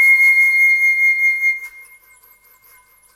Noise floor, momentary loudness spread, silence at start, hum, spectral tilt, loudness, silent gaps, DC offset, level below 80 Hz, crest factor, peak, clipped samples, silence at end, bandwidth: -50 dBFS; 12 LU; 0 s; none; 4 dB/octave; -11 LUFS; none; under 0.1%; -70 dBFS; 10 dB; -6 dBFS; under 0.1%; 1.35 s; 16 kHz